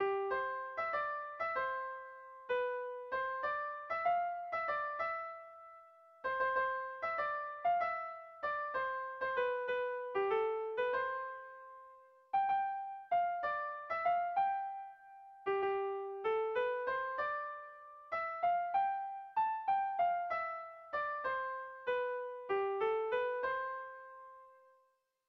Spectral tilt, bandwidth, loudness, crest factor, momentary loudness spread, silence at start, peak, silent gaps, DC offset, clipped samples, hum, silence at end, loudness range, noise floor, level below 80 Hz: -0.5 dB/octave; 6 kHz; -37 LUFS; 14 dB; 13 LU; 0 s; -24 dBFS; none; under 0.1%; under 0.1%; none; 0.75 s; 2 LU; -76 dBFS; -76 dBFS